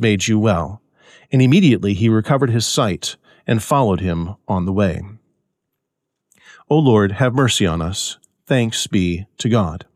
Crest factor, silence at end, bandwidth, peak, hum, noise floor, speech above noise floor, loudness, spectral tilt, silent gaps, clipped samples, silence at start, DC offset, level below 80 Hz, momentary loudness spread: 14 dB; 0.1 s; 15 kHz; -4 dBFS; none; -78 dBFS; 61 dB; -17 LUFS; -5.5 dB/octave; none; under 0.1%; 0 s; under 0.1%; -42 dBFS; 11 LU